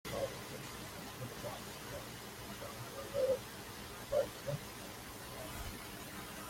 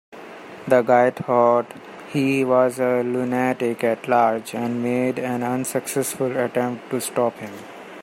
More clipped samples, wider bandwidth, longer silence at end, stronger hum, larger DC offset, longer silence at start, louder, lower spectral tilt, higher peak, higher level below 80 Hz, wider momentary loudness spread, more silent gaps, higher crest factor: neither; about the same, 16.5 kHz vs 16 kHz; about the same, 0 s vs 0 s; neither; neither; about the same, 0.05 s vs 0.1 s; second, -43 LUFS vs -21 LUFS; second, -4 dB/octave vs -5.5 dB/octave; second, -22 dBFS vs -2 dBFS; first, -60 dBFS vs -70 dBFS; second, 10 LU vs 18 LU; neither; about the same, 20 dB vs 20 dB